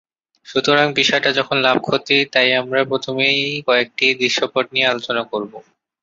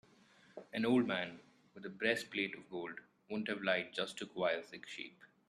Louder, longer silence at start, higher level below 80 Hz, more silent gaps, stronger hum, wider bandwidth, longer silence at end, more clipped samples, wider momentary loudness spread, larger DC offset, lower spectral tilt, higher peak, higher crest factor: first, -16 LUFS vs -38 LUFS; about the same, 0.5 s vs 0.55 s; first, -62 dBFS vs -82 dBFS; neither; neither; second, 7.8 kHz vs 13 kHz; first, 0.4 s vs 0.2 s; neither; second, 7 LU vs 18 LU; neither; about the same, -3.5 dB/octave vs -4.5 dB/octave; first, -2 dBFS vs -18 dBFS; second, 16 dB vs 22 dB